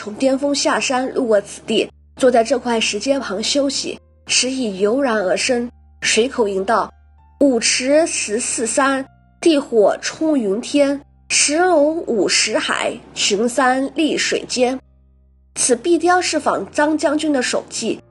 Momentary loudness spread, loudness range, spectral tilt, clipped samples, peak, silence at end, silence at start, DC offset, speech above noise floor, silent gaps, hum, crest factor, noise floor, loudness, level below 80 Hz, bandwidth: 6 LU; 2 LU; -2 dB/octave; under 0.1%; -2 dBFS; 0.1 s; 0 s; under 0.1%; 35 dB; none; none; 16 dB; -52 dBFS; -17 LUFS; -54 dBFS; 11.5 kHz